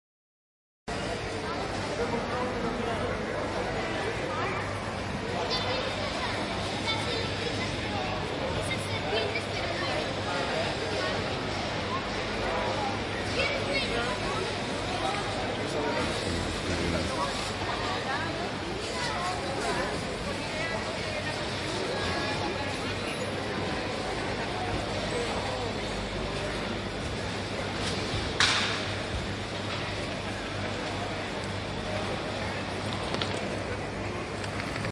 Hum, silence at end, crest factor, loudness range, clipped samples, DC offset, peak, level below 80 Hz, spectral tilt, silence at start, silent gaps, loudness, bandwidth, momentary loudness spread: none; 0 s; 22 dB; 3 LU; under 0.1%; under 0.1%; -8 dBFS; -46 dBFS; -4 dB/octave; 0.85 s; none; -31 LUFS; 11.5 kHz; 4 LU